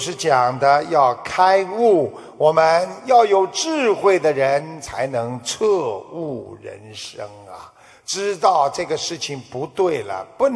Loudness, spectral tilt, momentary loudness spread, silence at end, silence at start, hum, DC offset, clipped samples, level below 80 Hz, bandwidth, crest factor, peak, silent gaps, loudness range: -18 LUFS; -4 dB/octave; 17 LU; 0 s; 0 s; none; under 0.1%; under 0.1%; -60 dBFS; 11 kHz; 16 dB; -2 dBFS; none; 9 LU